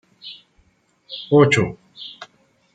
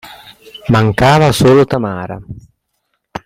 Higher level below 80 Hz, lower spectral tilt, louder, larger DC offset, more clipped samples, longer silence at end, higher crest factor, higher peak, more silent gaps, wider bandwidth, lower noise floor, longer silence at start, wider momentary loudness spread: second, -56 dBFS vs -38 dBFS; about the same, -6 dB/octave vs -6 dB/octave; second, -17 LUFS vs -11 LUFS; neither; neither; first, 0.5 s vs 0.05 s; first, 20 dB vs 14 dB; about the same, -2 dBFS vs 0 dBFS; neither; second, 9.4 kHz vs 16.5 kHz; second, -60 dBFS vs -68 dBFS; first, 0.25 s vs 0.05 s; first, 24 LU vs 20 LU